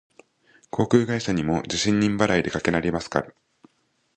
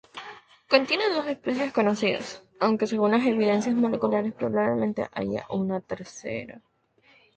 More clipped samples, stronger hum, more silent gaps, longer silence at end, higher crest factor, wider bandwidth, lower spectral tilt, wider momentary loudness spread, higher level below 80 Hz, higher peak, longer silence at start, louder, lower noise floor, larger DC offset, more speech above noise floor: neither; neither; neither; about the same, 0.85 s vs 0.8 s; about the same, 22 dB vs 22 dB; about the same, 9.4 kHz vs 8.8 kHz; about the same, -5 dB/octave vs -5.5 dB/octave; second, 7 LU vs 13 LU; first, -48 dBFS vs -64 dBFS; about the same, -2 dBFS vs -4 dBFS; first, 0.75 s vs 0.15 s; first, -23 LUFS vs -26 LUFS; first, -69 dBFS vs -61 dBFS; neither; first, 46 dB vs 36 dB